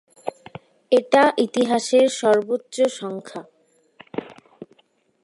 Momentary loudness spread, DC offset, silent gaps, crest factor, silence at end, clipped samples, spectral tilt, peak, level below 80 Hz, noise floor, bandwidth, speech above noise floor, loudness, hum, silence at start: 18 LU; under 0.1%; none; 18 dB; 0.6 s; under 0.1%; -3.5 dB/octave; -4 dBFS; -74 dBFS; -63 dBFS; 11.5 kHz; 44 dB; -19 LUFS; none; 0.25 s